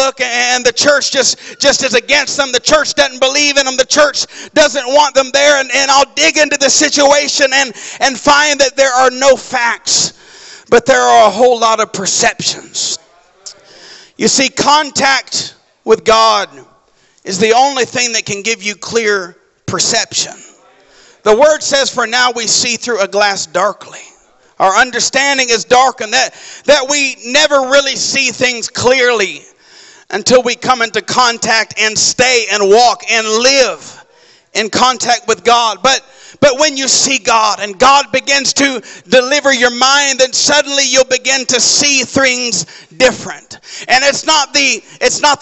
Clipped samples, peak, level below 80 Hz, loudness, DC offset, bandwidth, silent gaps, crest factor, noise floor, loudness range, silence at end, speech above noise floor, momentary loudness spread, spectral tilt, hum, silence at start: under 0.1%; 0 dBFS; -48 dBFS; -10 LUFS; under 0.1%; 8.6 kHz; none; 12 dB; -51 dBFS; 4 LU; 0.05 s; 40 dB; 8 LU; -1 dB/octave; none; 0 s